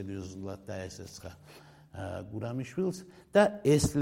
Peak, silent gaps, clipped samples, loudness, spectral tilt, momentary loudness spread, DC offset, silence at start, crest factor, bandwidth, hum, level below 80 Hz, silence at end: -10 dBFS; none; under 0.1%; -31 LUFS; -5.5 dB/octave; 21 LU; under 0.1%; 0 s; 20 dB; 16 kHz; none; -54 dBFS; 0 s